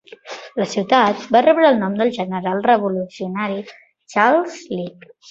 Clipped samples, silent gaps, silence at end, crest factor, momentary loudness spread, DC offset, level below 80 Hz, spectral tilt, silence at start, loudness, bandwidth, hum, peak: under 0.1%; none; 0.4 s; 18 dB; 15 LU; under 0.1%; -64 dBFS; -5.5 dB/octave; 0.25 s; -18 LUFS; 7.8 kHz; none; 0 dBFS